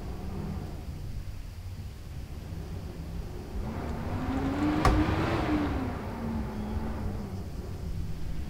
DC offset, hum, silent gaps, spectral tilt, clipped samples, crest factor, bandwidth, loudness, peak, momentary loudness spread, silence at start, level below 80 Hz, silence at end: under 0.1%; none; none; -7 dB/octave; under 0.1%; 22 dB; 16 kHz; -33 LUFS; -10 dBFS; 14 LU; 0 s; -38 dBFS; 0 s